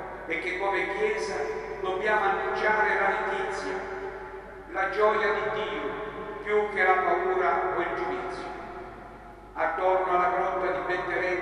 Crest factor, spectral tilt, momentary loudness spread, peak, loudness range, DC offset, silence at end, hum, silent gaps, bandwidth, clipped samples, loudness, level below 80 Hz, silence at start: 18 dB; -4.5 dB/octave; 14 LU; -8 dBFS; 3 LU; under 0.1%; 0 s; none; none; 11.5 kHz; under 0.1%; -27 LUFS; -54 dBFS; 0 s